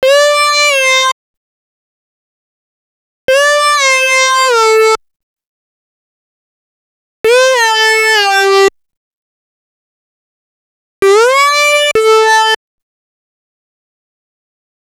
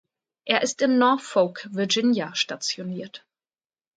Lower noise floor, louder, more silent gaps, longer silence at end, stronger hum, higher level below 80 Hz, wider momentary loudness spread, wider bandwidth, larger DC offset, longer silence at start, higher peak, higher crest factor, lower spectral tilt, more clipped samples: about the same, under -90 dBFS vs under -90 dBFS; first, -8 LUFS vs -23 LUFS; first, 1.12-3.28 s, 5.16-5.36 s, 5.46-7.24 s, 8.97-11.02 s vs none; first, 2.45 s vs 0.8 s; neither; first, -56 dBFS vs -76 dBFS; second, 6 LU vs 14 LU; first, 18 kHz vs 9.2 kHz; neither; second, 0 s vs 0.45 s; first, 0 dBFS vs -4 dBFS; second, 12 dB vs 22 dB; second, 0.5 dB/octave vs -3.5 dB/octave; neither